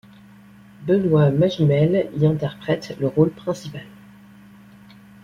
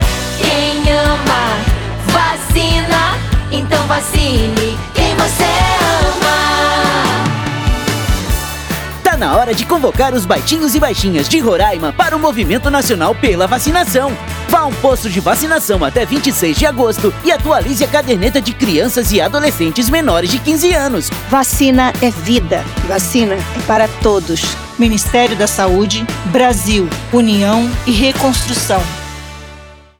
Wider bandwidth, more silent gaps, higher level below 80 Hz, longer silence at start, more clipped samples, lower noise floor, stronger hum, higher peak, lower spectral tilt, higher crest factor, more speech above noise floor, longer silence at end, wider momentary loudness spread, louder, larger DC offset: second, 7.2 kHz vs over 20 kHz; neither; second, -54 dBFS vs -24 dBFS; first, 0.8 s vs 0 s; neither; first, -47 dBFS vs -36 dBFS; neither; second, -4 dBFS vs 0 dBFS; first, -8.5 dB/octave vs -4 dB/octave; first, 18 dB vs 12 dB; first, 28 dB vs 23 dB; first, 1.4 s vs 0.25 s; first, 13 LU vs 5 LU; second, -20 LUFS vs -13 LUFS; neither